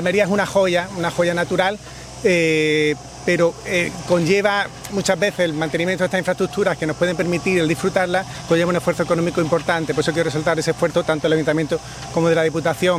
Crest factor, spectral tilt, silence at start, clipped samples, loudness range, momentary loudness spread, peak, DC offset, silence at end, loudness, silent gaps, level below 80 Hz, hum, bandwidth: 16 dB; -5 dB/octave; 0 s; under 0.1%; 1 LU; 5 LU; -2 dBFS; under 0.1%; 0 s; -19 LUFS; none; -48 dBFS; none; 16 kHz